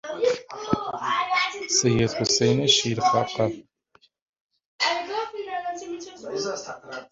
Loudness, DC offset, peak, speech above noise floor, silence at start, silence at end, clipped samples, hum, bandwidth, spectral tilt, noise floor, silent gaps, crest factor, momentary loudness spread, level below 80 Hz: -24 LUFS; under 0.1%; -6 dBFS; 40 dB; 0.05 s; 0.05 s; under 0.1%; none; 7.8 kHz; -3.5 dB/octave; -62 dBFS; 4.22-4.33 s, 4.41-4.49 s, 4.66-4.79 s; 20 dB; 15 LU; -56 dBFS